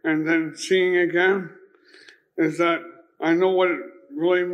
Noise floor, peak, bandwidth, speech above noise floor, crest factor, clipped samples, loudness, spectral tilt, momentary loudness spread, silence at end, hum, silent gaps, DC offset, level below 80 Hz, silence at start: -51 dBFS; -8 dBFS; 11 kHz; 30 dB; 16 dB; under 0.1%; -22 LUFS; -5 dB/octave; 10 LU; 0 s; none; none; under 0.1%; -80 dBFS; 0.05 s